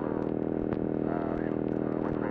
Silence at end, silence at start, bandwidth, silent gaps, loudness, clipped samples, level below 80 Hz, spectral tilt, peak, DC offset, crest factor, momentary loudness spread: 0 s; 0 s; 4.6 kHz; none; -31 LUFS; under 0.1%; -50 dBFS; -11 dB/octave; -16 dBFS; under 0.1%; 14 dB; 1 LU